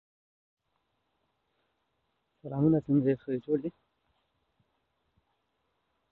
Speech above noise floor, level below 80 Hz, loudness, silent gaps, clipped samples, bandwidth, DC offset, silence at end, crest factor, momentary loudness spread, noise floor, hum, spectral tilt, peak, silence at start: 51 dB; -68 dBFS; -29 LUFS; none; under 0.1%; 4.1 kHz; under 0.1%; 2.4 s; 20 dB; 14 LU; -79 dBFS; none; -12 dB/octave; -14 dBFS; 2.45 s